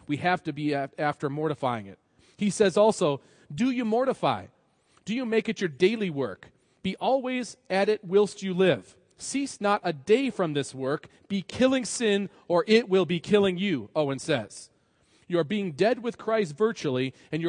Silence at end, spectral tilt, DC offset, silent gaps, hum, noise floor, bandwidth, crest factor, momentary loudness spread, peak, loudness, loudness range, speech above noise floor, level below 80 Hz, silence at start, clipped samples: 0 s; -5 dB/octave; under 0.1%; none; none; -65 dBFS; 10.5 kHz; 18 dB; 10 LU; -8 dBFS; -27 LUFS; 3 LU; 39 dB; -68 dBFS; 0.1 s; under 0.1%